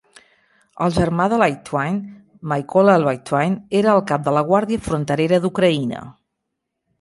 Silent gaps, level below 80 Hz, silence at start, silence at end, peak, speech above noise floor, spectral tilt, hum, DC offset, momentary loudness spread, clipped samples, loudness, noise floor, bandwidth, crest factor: none; -48 dBFS; 0.8 s; 0.9 s; -2 dBFS; 60 dB; -7 dB/octave; none; under 0.1%; 9 LU; under 0.1%; -18 LUFS; -78 dBFS; 11.5 kHz; 18 dB